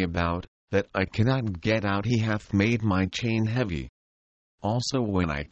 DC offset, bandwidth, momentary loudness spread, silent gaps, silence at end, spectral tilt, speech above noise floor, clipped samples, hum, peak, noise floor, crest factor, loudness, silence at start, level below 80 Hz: under 0.1%; 8.4 kHz; 6 LU; 0.48-0.68 s, 3.89-4.58 s; 0.05 s; -6.5 dB/octave; over 64 dB; under 0.1%; none; -8 dBFS; under -90 dBFS; 18 dB; -27 LUFS; 0 s; -46 dBFS